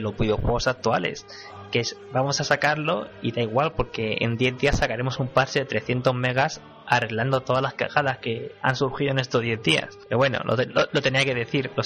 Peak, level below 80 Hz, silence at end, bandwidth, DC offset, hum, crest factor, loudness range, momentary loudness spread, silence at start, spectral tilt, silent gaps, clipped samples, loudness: -6 dBFS; -42 dBFS; 0 s; 10.5 kHz; under 0.1%; none; 18 dB; 2 LU; 6 LU; 0 s; -5 dB/octave; none; under 0.1%; -24 LUFS